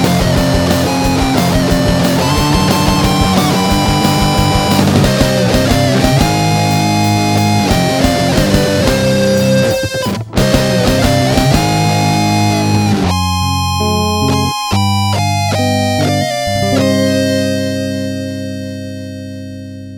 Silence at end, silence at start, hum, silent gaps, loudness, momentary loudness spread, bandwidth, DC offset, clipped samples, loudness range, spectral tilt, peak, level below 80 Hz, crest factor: 0 s; 0 s; 50 Hz at -35 dBFS; none; -12 LUFS; 6 LU; over 20 kHz; under 0.1%; under 0.1%; 3 LU; -5 dB/octave; 0 dBFS; -26 dBFS; 12 dB